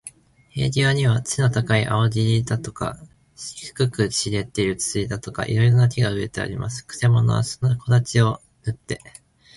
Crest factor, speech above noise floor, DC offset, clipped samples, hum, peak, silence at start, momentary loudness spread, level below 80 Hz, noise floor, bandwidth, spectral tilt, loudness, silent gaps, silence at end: 16 dB; 24 dB; under 0.1%; under 0.1%; none; -4 dBFS; 0.05 s; 13 LU; -46 dBFS; -45 dBFS; 11.5 kHz; -5.5 dB/octave; -21 LUFS; none; 0.6 s